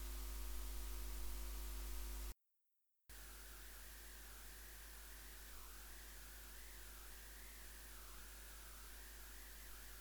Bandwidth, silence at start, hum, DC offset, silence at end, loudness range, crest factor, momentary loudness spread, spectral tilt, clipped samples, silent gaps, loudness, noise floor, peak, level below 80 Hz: over 20 kHz; 0 s; none; under 0.1%; 0 s; 4 LU; 16 dB; 5 LU; -2.5 dB/octave; under 0.1%; none; -54 LUFS; -84 dBFS; -36 dBFS; -54 dBFS